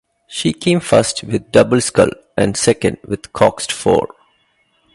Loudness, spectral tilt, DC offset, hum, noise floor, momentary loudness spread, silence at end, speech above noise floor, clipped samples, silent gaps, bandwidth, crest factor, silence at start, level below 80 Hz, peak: -15 LUFS; -4.5 dB/octave; under 0.1%; none; -60 dBFS; 8 LU; 0.9 s; 45 dB; under 0.1%; none; 11.5 kHz; 16 dB; 0.3 s; -44 dBFS; 0 dBFS